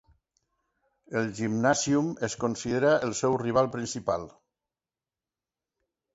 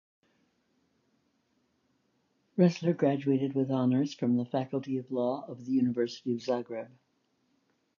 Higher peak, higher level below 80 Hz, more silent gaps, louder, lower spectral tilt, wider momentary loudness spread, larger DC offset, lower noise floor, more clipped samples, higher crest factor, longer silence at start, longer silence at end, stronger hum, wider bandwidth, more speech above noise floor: first, -8 dBFS vs -12 dBFS; first, -60 dBFS vs -80 dBFS; neither; first, -27 LUFS vs -30 LUFS; second, -5 dB/octave vs -8 dB/octave; about the same, 8 LU vs 9 LU; neither; first, under -90 dBFS vs -74 dBFS; neither; about the same, 20 dB vs 20 dB; second, 1.1 s vs 2.55 s; first, 1.85 s vs 1.1 s; neither; first, 8 kHz vs 7.2 kHz; first, over 63 dB vs 45 dB